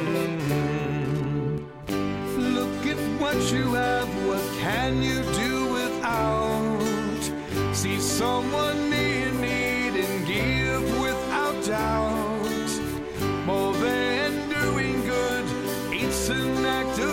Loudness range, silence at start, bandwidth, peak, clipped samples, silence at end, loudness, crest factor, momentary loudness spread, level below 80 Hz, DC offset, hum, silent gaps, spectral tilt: 1 LU; 0 s; 17 kHz; -12 dBFS; under 0.1%; 0 s; -25 LUFS; 12 dB; 5 LU; -42 dBFS; under 0.1%; none; none; -4.5 dB/octave